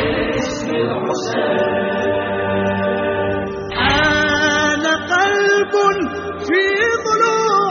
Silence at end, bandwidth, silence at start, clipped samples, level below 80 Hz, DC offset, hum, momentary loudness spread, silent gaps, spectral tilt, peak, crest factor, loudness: 0 s; 7.2 kHz; 0 s; under 0.1%; -40 dBFS; under 0.1%; none; 7 LU; none; -2.5 dB/octave; -2 dBFS; 14 dB; -17 LUFS